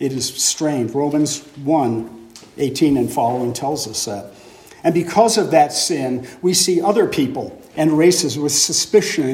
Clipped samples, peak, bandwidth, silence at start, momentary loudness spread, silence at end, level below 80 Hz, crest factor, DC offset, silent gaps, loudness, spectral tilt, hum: under 0.1%; 0 dBFS; 16.5 kHz; 0 s; 10 LU; 0 s; -56 dBFS; 16 dB; under 0.1%; none; -17 LUFS; -3.5 dB/octave; none